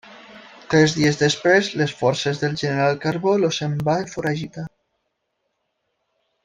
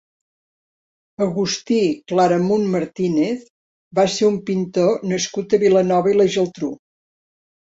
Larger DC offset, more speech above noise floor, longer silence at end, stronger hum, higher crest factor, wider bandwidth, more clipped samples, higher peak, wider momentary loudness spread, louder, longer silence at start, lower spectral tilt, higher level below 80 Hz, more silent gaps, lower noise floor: neither; second, 55 dB vs over 72 dB; first, 1.8 s vs 0.9 s; neither; about the same, 20 dB vs 16 dB; first, 9.6 kHz vs 8 kHz; neither; about the same, -2 dBFS vs -4 dBFS; about the same, 8 LU vs 8 LU; about the same, -20 LUFS vs -19 LUFS; second, 0.05 s vs 1.2 s; about the same, -5 dB/octave vs -5.5 dB/octave; about the same, -56 dBFS vs -60 dBFS; second, none vs 3.50-3.91 s; second, -75 dBFS vs under -90 dBFS